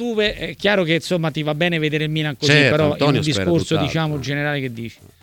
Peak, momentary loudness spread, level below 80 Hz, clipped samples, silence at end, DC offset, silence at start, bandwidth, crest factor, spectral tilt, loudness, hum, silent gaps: -2 dBFS; 8 LU; -48 dBFS; under 0.1%; 0.3 s; under 0.1%; 0 s; 17 kHz; 18 dB; -5.5 dB/octave; -19 LUFS; none; none